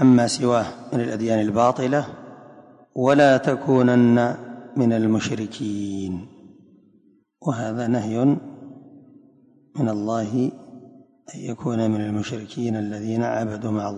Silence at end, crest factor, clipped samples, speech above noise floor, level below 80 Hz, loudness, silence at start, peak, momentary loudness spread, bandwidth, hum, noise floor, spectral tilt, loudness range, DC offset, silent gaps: 0 s; 16 dB; under 0.1%; 38 dB; -58 dBFS; -22 LUFS; 0 s; -6 dBFS; 18 LU; 11 kHz; none; -59 dBFS; -6.5 dB/octave; 8 LU; under 0.1%; none